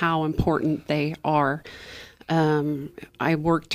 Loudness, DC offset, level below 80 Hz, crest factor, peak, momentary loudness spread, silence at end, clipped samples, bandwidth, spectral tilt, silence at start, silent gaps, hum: -24 LUFS; under 0.1%; -44 dBFS; 16 dB; -8 dBFS; 18 LU; 0 s; under 0.1%; 15 kHz; -7 dB/octave; 0 s; none; none